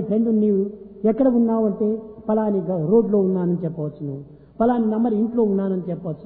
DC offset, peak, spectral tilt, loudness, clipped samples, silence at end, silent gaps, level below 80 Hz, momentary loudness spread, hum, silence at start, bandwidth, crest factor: under 0.1%; -6 dBFS; -13.5 dB/octave; -21 LUFS; under 0.1%; 0 s; none; -54 dBFS; 11 LU; none; 0 s; 3.7 kHz; 16 dB